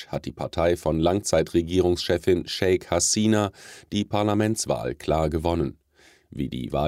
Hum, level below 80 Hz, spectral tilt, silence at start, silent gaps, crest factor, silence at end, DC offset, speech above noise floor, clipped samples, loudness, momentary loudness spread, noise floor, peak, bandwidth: none; -42 dBFS; -4.5 dB/octave; 0 s; none; 18 dB; 0 s; under 0.1%; 34 dB; under 0.1%; -24 LUFS; 10 LU; -57 dBFS; -6 dBFS; 16 kHz